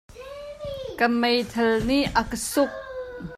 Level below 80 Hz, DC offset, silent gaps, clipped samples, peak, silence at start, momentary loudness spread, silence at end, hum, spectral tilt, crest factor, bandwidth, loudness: -44 dBFS; under 0.1%; none; under 0.1%; -6 dBFS; 0.1 s; 15 LU; 0 s; none; -4 dB/octave; 20 dB; 16 kHz; -23 LUFS